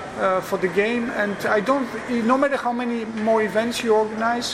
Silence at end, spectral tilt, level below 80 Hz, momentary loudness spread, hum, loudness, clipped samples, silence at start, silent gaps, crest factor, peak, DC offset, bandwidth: 0 s; -4.5 dB/octave; -56 dBFS; 4 LU; none; -22 LUFS; under 0.1%; 0 s; none; 16 dB; -6 dBFS; under 0.1%; 15.5 kHz